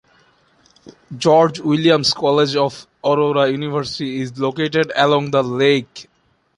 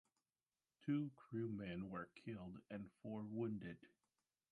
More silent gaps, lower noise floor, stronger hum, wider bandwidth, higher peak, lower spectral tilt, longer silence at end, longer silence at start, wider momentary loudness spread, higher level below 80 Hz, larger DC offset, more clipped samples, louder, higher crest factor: neither; second, -56 dBFS vs under -90 dBFS; neither; about the same, 11 kHz vs 10.5 kHz; first, -2 dBFS vs -32 dBFS; second, -5.5 dB/octave vs -9 dB/octave; about the same, 0.55 s vs 0.65 s; first, 1.1 s vs 0.8 s; about the same, 10 LU vs 10 LU; first, -58 dBFS vs -76 dBFS; neither; neither; first, -17 LUFS vs -49 LUFS; about the same, 16 dB vs 18 dB